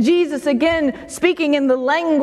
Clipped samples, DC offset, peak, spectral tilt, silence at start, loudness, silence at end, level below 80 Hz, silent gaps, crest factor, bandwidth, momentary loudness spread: under 0.1%; under 0.1%; -2 dBFS; -4.5 dB/octave; 0 s; -17 LUFS; 0 s; -50 dBFS; none; 14 dB; 13 kHz; 4 LU